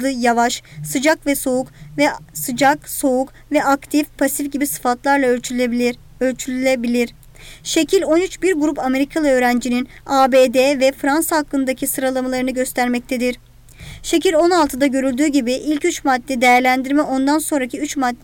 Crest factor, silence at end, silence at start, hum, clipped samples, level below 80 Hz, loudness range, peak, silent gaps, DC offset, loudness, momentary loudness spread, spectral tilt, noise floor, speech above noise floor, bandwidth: 12 dB; 0.1 s; 0 s; none; under 0.1%; -46 dBFS; 3 LU; -6 dBFS; none; under 0.1%; -17 LUFS; 7 LU; -3 dB/octave; -38 dBFS; 21 dB; 19 kHz